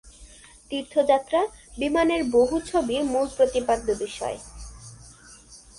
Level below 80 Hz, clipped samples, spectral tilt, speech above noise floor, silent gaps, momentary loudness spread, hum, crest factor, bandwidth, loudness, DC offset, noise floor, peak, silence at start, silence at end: -48 dBFS; under 0.1%; -4 dB/octave; 25 dB; none; 19 LU; none; 18 dB; 11.5 kHz; -24 LUFS; under 0.1%; -49 dBFS; -8 dBFS; 0.05 s; 0.2 s